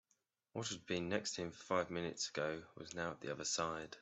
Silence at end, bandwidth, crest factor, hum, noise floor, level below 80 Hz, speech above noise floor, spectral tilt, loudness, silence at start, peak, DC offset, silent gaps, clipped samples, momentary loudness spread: 0 s; 8.2 kHz; 22 dB; none; -83 dBFS; -76 dBFS; 41 dB; -3 dB/octave; -42 LUFS; 0.55 s; -22 dBFS; under 0.1%; none; under 0.1%; 7 LU